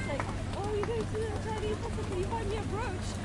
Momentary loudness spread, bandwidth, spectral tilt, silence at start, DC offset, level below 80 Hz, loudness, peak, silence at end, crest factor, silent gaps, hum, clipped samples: 2 LU; 11.5 kHz; -6 dB/octave; 0 s; under 0.1%; -42 dBFS; -34 LUFS; -16 dBFS; 0 s; 16 dB; none; none; under 0.1%